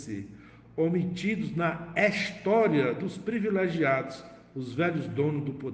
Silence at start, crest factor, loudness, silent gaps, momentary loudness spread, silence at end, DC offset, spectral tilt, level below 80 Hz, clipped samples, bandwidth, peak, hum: 0 s; 18 dB; -28 LUFS; none; 15 LU; 0 s; under 0.1%; -7 dB/octave; -62 dBFS; under 0.1%; 9.2 kHz; -10 dBFS; none